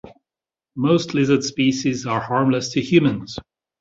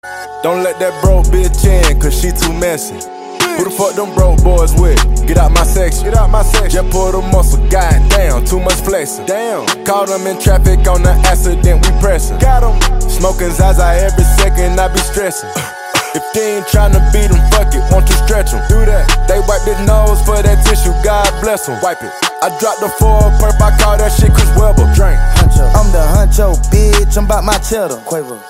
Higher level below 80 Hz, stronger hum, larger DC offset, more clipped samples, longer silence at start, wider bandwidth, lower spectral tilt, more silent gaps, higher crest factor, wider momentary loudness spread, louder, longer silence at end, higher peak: second, -54 dBFS vs -10 dBFS; neither; neither; second, under 0.1% vs 0.3%; about the same, 0.05 s vs 0.05 s; second, 7.8 kHz vs 16 kHz; about the same, -5.5 dB/octave vs -5 dB/octave; neither; first, 18 dB vs 8 dB; first, 13 LU vs 6 LU; second, -20 LUFS vs -12 LUFS; first, 0.4 s vs 0 s; about the same, -2 dBFS vs 0 dBFS